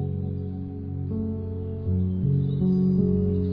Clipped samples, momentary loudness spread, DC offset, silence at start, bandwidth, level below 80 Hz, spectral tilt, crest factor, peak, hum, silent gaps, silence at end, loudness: under 0.1%; 10 LU; under 0.1%; 0 s; 5.2 kHz; -44 dBFS; -13.5 dB/octave; 12 dB; -12 dBFS; none; none; 0 s; -26 LUFS